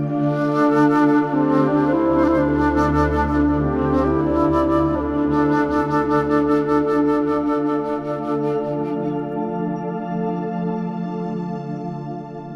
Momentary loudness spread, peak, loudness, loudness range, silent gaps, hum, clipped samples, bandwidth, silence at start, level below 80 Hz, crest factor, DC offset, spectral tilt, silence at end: 9 LU; -4 dBFS; -19 LUFS; 7 LU; none; none; under 0.1%; 6.8 kHz; 0 s; -36 dBFS; 14 dB; under 0.1%; -9 dB/octave; 0 s